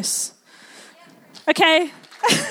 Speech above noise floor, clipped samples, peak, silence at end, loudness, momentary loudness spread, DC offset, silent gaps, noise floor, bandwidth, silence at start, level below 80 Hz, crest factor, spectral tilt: 30 dB; under 0.1%; 0 dBFS; 0 s; -19 LUFS; 13 LU; under 0.1%; none; -48 dBFS; 17 kHz; 0 s; -70 dBFS; 20 dB; -2 dB/octave